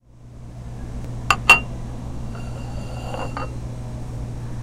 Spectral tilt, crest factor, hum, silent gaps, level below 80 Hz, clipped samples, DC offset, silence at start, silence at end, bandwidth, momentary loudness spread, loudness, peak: -3.5 dB/octave; 24 dB; none; none; -34 dBFS; under 0.1%; under 0.1%; 0.15 s; 0 s; 16 kHz; 22 LU; -22 LUFS; 0 dBFS